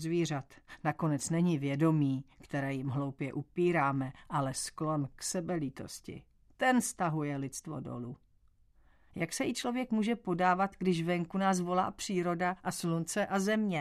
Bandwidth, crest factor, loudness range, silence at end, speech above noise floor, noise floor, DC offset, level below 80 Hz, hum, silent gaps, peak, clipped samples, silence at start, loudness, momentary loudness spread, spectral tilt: 14 kHz; 18 dB; 4 LU; 0 s; 33 dB; -66 dBFS; under 0.1%; -64 dBFS; none; none; -16 dBFS; under 0.1%; 0 s; -33 LUFS; 12 LU; -5.5 dB/octave